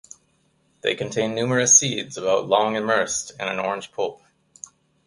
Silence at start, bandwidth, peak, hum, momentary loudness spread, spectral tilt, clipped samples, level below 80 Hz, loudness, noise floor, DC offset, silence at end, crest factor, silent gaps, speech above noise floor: 0.85 s; 11.5 kHz; -2 dBFS; none; 17 LU; -2 dB/octave; under 0.1%; -64 dBFS; -21 LUFS; -65 dBFS; under 0.1%; 0.9 s; 22 dB; none; 43 dB